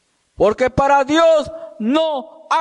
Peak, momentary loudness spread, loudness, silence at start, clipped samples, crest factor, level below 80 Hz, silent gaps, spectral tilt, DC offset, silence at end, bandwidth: -4 dBFS; 11 LU; -16 LUFS; 0.4 s; under 0.1%; 12 dB; -42 dBFS; none; -5 dB/octave; under 0.1%; 0 s; 10.5 kHz